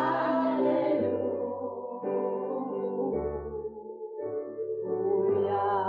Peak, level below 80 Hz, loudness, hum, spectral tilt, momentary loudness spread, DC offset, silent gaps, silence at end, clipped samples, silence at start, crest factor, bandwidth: -18 dBFS; -56 dBFS; -30 LUFS; none; -6 dB/octave; 11 LU; under 0.1%; none; 0 s; under 0.1%; 0 s; 12 dB; 5 kHz